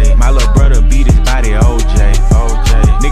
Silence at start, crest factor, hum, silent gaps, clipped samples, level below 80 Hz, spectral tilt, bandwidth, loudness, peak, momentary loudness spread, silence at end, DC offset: 0 s; 6 dB; none; none; under 0.1%; -8 dBFS; -5.5 dB/octave; 11 kHz; -11 LUFS; 0 dBFS; 2 LU; 0 s; under 0.1%